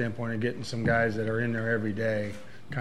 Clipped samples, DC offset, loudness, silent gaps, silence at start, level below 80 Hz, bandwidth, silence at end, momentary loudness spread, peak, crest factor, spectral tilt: under 0.1%; 0.9%; -29 LUFS; none; 0 s; -56 dBFS; 12 kHz; 0 s; 10 LU; -12 dBFS; 18 dB; -7 dB/octave